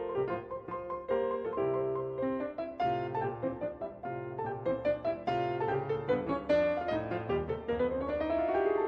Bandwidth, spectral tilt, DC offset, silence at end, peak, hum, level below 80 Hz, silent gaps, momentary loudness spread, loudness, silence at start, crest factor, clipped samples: 6.4 kHz; -8.5 dB/octave; under 0.1%; 0 s; -16 dBFS; none; -56 dBFS; none; 9 LU; -33 LUFS; 0 s; 16 dB; under 0.1%